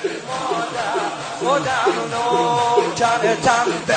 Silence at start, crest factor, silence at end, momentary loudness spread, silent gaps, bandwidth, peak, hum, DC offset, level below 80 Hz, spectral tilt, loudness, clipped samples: 0 s; 16 dB; 0 s; 7 LU; none; 9.4 kHz; -4 dBFS; none; under 0.1%; -58 dBFS; -3.5 dB/octave; -19 LUFS; under 0.1%